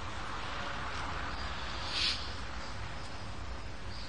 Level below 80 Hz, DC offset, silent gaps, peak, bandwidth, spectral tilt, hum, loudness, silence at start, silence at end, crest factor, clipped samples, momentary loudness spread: -46 dBFS; 0.8%; none; -18 dBFS; 10 kHz; -3 dB/octave; none; -38 LUFS; 0 s; 0 s; 22 dB; under 0.1%; 12 LU